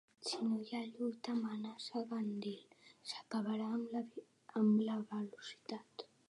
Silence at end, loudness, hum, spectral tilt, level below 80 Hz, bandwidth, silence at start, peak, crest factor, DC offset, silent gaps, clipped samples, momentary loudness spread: 0.25 s; -41 LUFS; none; -5.5 dB/octave; under -90 dBFS; 11 kHz; 0.2 s; -24 dBFS; 16 dB; under 0.1%; none; under 0.1%; 14 LU